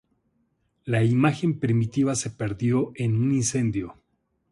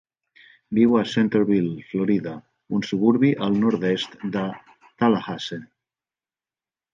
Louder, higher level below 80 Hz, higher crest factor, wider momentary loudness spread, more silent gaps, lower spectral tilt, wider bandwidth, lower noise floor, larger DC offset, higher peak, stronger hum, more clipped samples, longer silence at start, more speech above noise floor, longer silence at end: about the same, -24 LUFS vs -22 LUFS; first, -54 dBFS vs -64 dBFS; about the same, 18 dB vs 18 dB; second, 8 LU vs 13 LU; neither; about the same, -6 dB/octave vs -7 dB/octave; first, 11.5 kHz vs 7.4 kHz; second, -73 dBFS vs under -90 dBFS; neither; about the same, -6 dBFS vs -6 dBFS; neither; neither; first, 0.85 s vs 0.7 s; second, 49 dB vs over 69 dB; second, 0.6 s vs 1.3 s